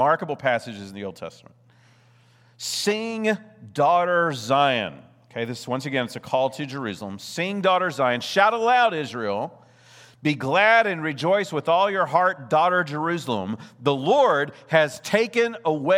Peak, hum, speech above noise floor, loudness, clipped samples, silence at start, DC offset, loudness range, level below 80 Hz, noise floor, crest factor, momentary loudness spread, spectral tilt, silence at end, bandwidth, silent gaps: -2 dBFS; none; 34 dB; -22 LUFS; under 0.1%; 0 s; under 0.1%; 5 LU; -74 dBFS; -56 dBFS; 20 dB; 14 LU; -4.5 dB/octave; 0 s; 16 kHz; none